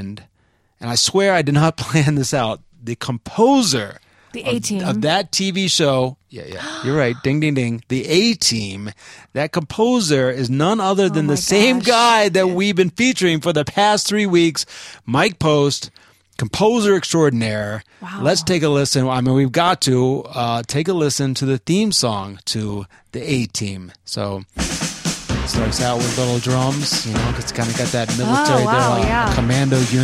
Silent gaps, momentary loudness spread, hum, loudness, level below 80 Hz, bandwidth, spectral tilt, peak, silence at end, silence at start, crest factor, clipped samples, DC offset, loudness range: none; 12 LU; none; -17 LUFS; -38 dBFS; 15 kHz; -4.5 dB/octave; 0 dBFS; 0 s; 0 s; 18 dB; under 0.1%; under 0.1%; 5 LU